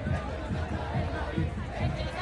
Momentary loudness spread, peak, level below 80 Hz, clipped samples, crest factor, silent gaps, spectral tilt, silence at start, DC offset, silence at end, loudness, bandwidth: 2 LU; -16 dBFS; -40 dBFS; under 0.1%; 14 dB; none; -7 dB/octave; 0 s; under 0.1%; 0 s; -33 LUFS; 11 kHz